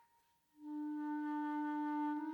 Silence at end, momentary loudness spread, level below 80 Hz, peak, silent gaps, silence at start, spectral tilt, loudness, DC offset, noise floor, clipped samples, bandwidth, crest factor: 0 s; 8 LU; under -90 dBFS; -30 dBFS; none; 0.6 s; -5.5 dB/octave; -41 LUFS; under 0.1%; -76 dBFS; under 0.1%; 4.6 kHz; 10 dB